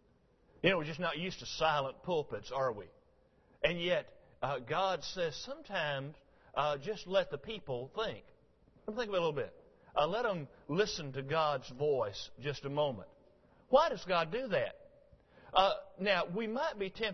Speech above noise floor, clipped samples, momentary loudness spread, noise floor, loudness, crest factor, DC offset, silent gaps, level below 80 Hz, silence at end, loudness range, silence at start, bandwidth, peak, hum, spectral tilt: 34 dB; under 0.1%; 10 LU; -69 dBFS; -35 LUFS; 24 dB; under 0.1%; none; -62 dBFS; 0 s; 4 LU; 0.65 s; 6.2 kHz; -12 dBFS; none; -2.5 dB/octave